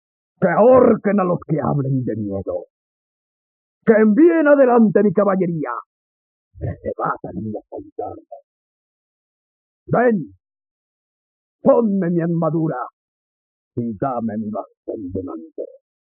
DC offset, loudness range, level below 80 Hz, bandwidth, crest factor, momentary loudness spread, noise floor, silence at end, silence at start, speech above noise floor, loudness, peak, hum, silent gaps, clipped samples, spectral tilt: under 0.1%; 13 LU; -56 dBFS; 3.1 kHz; 18 dB; 19 LU; under -90 dBFS; 0.45 s; 0.4 s; over 73 dB; -18 LUFS; -2 dBFS; none; 2.70-3.81 s, 5.86-6.51 s, 7.92-7.96 s, 8.44-9.86 s, 10.71-11.59 s, 12.93-13.71 s, 14.77-14.83 s; under 0.1%; -10 dB/octave